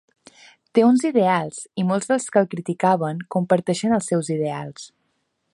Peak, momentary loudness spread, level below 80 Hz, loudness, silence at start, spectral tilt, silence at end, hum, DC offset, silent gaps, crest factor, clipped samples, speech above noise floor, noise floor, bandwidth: -4 dBFS; 10 LU; -66 dBFS; -21 LUFS; 0.75 s; -6 dB/octave; 0.7 s; none; under 0.1%; none; 18 dB; under 0.1%; 51 dB; -72 dBFS; 11.5 kHz